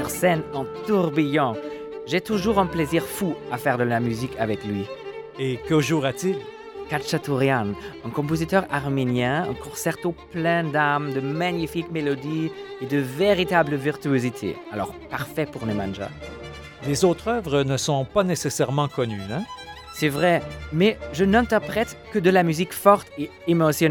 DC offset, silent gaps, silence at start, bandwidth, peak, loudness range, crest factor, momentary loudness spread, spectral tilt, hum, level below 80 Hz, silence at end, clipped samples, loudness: under 0.1%; none; 0 s; 19 kHz; -2 dBFS; 4 LU; 22 dB; 11 LU; -5.5 dB/octave; none; -48 dBFS; 0 s; under 0.1%; -23 LUFS